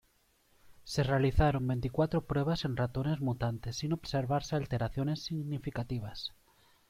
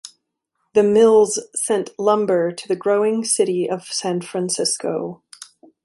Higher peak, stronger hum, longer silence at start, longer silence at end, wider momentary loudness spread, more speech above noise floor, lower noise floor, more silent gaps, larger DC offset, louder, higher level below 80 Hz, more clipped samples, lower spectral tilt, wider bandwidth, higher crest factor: second, -14 dBFS vs -2 dBFS; neither; first, 0.65 s vs 0.05 s; first, 0.6 s vs 0.4 s; about the same, 8 LU vs 10 LU; second, 38 dB vs 55 dB; second, -70 dBFS vs -74 dBFS; neither; neither; second, -33 LUFS vs -19 LUFS; first, -46 dBFS vs -66 dBFS; neither; first, -6.5 dB/octave vs -4 dB/octave; first, 15 kHz vs 12 kHz; about the same, 20 dB vs 16 dB